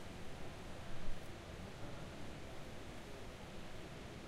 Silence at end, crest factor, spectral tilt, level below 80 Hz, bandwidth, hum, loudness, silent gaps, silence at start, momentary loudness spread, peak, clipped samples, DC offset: 0 s; 16 dB; -5 dB/octave; -54 dBFS; 13 kHz; none; -52 LUFS; none; 0 s; 1 LU; -28 dBFS; under 0.1%; under 0.1%